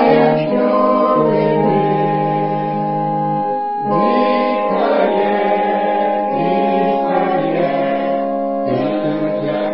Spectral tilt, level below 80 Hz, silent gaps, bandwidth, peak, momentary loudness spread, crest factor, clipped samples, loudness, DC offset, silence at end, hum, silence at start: -12 dB/octave; -62 dBFS; none; 5.6 kHz; 0 dBFS; 5 LU; 14 dB; under 0.1%; -16 LUFS; 0.7%; 0 s; none; 0 s